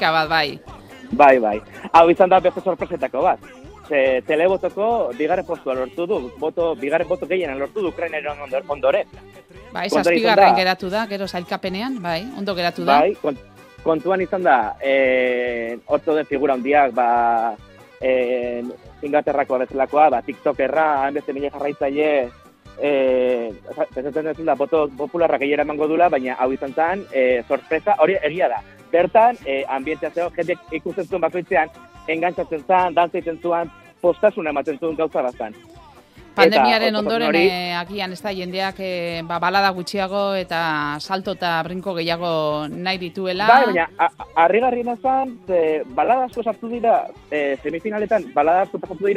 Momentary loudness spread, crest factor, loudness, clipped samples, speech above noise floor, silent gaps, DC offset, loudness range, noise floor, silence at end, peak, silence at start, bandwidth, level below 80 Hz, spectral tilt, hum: 11 LU; 20 dB; -20 LUFS; under 0.1%; 26 dB; none; under 0.1%; 4 LU; -45 dBFS; 0 s; 0 dBFS; 0 s; 14.5 kHz; -52 dBFS; -5.5 dB/octave; none